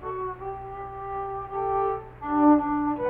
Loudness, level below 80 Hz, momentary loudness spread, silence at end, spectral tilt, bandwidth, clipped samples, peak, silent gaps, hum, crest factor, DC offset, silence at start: -26 LUFS; -50 dBFS; 16 LU; 0 s; -10.5 dB/octave; 3.4 kHz; under 0.1%; -8 dBFS; none; none; 18 dB; under 0.1%; 0 s